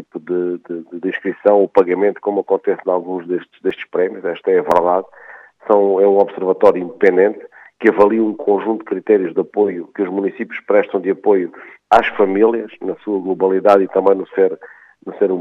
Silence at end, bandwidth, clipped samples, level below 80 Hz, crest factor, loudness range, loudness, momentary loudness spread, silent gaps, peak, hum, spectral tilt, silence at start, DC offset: 0 s; 6.8 kHz; under 0.1%; -60 dBFS; 16 dB; 3 LU; -16 LUFS; 11 LU; none; 0 dBFS; none; -7.5 dB/octave; 0 s; under 0.1%